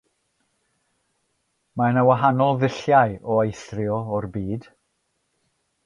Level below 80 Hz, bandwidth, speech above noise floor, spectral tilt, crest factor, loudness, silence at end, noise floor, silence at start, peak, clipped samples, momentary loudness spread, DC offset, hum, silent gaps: -54 dBFS; 10.5 kHz; 52 dB; -7.5 dB/octave; 20 dB; -21 LUFS; 1.25 s; -72 dBFS; 1.75 s; -4 dBFS; under 0.1%; 12 LU; under 0.1%; none; none